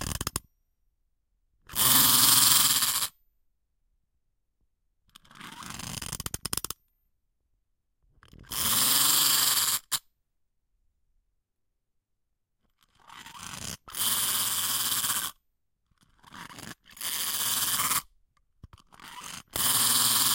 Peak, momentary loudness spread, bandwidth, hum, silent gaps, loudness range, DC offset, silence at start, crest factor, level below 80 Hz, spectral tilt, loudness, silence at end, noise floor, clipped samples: -4 dBFS; 23 LU; 17 kHz; none; none; 16 LU; under 0.1%; 0 s; 26 dB; -56 dBFS; 0 dB/octave; -23 LUFS; 0 s; -80 dBFS; under 0.1%